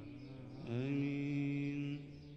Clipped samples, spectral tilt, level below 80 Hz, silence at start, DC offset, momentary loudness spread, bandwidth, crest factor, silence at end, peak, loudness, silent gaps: under 0.1%; -8.5 dB/octave; -66 dBFS; 0 s; under 0.1%; 13 LU; 7.8 kHz; 12 dB; 0 s; -28 dBFS; -40 LUFS; none